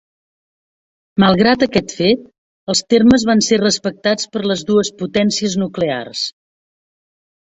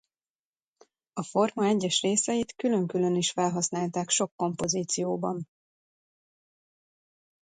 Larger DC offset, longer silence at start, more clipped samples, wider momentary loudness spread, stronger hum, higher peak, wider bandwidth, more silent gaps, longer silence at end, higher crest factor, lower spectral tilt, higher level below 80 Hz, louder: neither; about the same, 1.15 s vs 1.15 s; neither; about the same, 9 LU vs 7 LU; neither; first, -2 dBFS vs -12 dBFS; second, 8.2 kHz vs 10.5 kHz; first, 2.38-2.67 s vs 4.32-4.38 s; second, 1.25 s vs 2.05 s; about the same, 16 dB vs 18 dB; about the same, -4.5 dB/octave vs -4 dB/octave; first, -48 dBFS vs -68 dBFS; first, -15 LUFS vs -27 LUFS